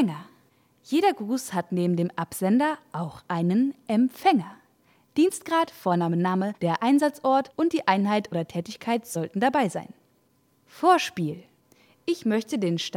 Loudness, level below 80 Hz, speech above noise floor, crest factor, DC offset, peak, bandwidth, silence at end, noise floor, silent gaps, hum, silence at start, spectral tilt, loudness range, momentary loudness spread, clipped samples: -25 LUFS; -72 dBFS; 41 dB; 20 dB; under 0.1%; -6 dBFS; 17 kHz; 0 s; -65 dBFS; none; none; 0 s; -6 dB/octave; 3 LU; 10 LU; under 0.1%